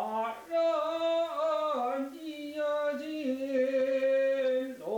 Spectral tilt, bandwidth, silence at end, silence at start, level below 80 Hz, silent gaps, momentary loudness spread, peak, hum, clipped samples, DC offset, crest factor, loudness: -4 dB/octave; 19.5 kHz; 0 s; 0 s; -80 dBFS; none; 7 LU; -20 dBFS; none; under 0.1%; under 0.1%; 10 dB; -31 LUFS